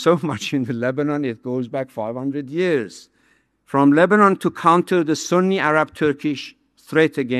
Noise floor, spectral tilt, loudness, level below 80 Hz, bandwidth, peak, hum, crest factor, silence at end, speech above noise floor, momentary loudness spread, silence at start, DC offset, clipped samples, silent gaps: -61 dBFS; -6 dB/octave; -19 LUFS; -64 dBFS; 13 kHz; -2 dBFS; none; 18 dB; 0 s; 43 dB; 12 LU; 0 s; under 0.1%; under 0.1%; none